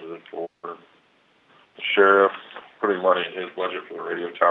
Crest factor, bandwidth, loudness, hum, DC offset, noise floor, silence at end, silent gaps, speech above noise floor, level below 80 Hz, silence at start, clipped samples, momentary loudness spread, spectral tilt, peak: 22 dB; 4.1 kHz; -22 LUFS; none; under 0.1%; -61 dBFS; 0 s; none; 40 dB; -84 dBFS; 0 s; under 0.1%; 22 LU; -6.5 dB/octave; -2 dBFS